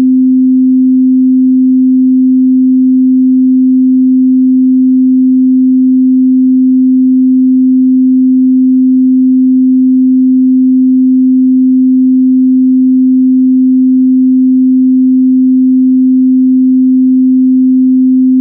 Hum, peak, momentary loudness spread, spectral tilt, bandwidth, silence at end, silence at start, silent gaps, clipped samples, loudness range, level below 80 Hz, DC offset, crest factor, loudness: none; -2 dBFS; 0 LU; -17.5 dB/octave; 0.4 kHz; 0 s; 0 s; none; under 0.1%; 0 LU; -70 dBFS; under 0.1%; 4 dB; -7 LUFS